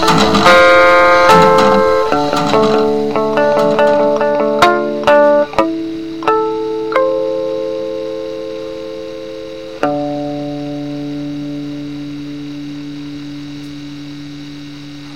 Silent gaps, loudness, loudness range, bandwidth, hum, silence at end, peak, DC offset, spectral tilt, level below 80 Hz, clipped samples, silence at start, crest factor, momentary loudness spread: none; -12 LUFS; 15 LU; 16.5 kHz; none; 0 s; 0 dBFS; 1%; -5 dB/octave; -42 dBFS; under 0.1%; 0 s; 14 dB; 20 LU